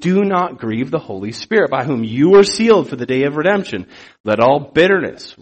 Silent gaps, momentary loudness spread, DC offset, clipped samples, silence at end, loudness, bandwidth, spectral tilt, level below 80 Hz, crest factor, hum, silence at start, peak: 4.20-4.24 s; 16 LU; under 0.1%; under 0.1%; 0.1 s; -15 LUFS; 8.8 kHz; -5.5 dB/octave; -54 dBFS; 14 dB; none; 0 s; 0 dBFS